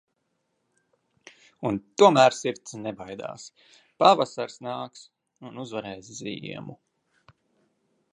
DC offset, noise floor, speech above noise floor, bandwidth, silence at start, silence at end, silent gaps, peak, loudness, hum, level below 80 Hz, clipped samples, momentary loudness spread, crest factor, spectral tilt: under 0.1%; -76 dBFS; 51 dB; 10.5 kHz; 1.6 s; 1.4 s; none; -4 dBFS; -24 LUFS; none; -70 dBFS; under 0.1%; 21 LU; 24 dB; -4.5 dB/octave